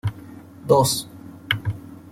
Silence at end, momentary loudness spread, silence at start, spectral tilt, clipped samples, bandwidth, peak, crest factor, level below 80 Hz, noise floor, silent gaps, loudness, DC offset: 0.15 s; 24 LU; 0.05 s; -4 dB/octave; under 0.1%; 16.5 kHz; -4 dBFS; 20 dB; -52 dBFS; -41 dBFS; none; -22 LUFS; under 0.1%